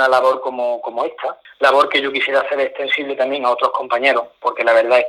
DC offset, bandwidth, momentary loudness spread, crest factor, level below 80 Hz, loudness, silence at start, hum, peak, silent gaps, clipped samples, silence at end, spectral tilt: under 0.1%; 12.5 kHz; 9 LU; 16 dB; -66 dBFS; -17 LUFS; 0 s; none; 0 dBFS; none; under 0.1%; 0 s; -2.5 dB/octave